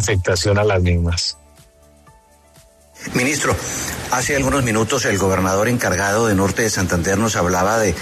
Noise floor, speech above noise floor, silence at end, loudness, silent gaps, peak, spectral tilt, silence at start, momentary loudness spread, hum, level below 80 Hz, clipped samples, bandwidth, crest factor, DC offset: -49 dBFS; 32 dB; 0 s; -18 LUFS; none; -6 dBFS; -4.5 dB/octave; 0 s; 5 LU; none; -36 dBFS; under 0.1%; 13.5 kHz; 14 dB; under 0.1%